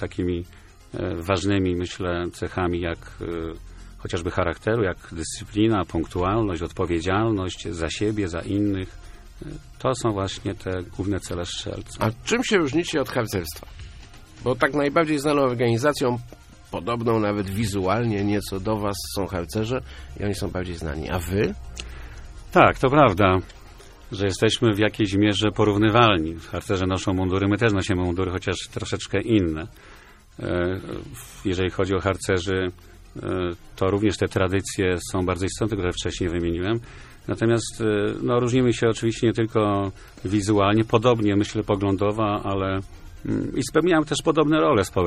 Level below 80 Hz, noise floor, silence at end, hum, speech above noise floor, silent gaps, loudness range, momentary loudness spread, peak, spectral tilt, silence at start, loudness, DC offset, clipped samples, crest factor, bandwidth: -42 dBFS; -44 dBFS; 0 s; none; 21 dB; none; 6 LU; 13 LU; 0 dBFS; -5.5 dB/octave; 0 s; -23 LUFS; under 0.1%; under 0.1%; 24 dB; 15.5 kHz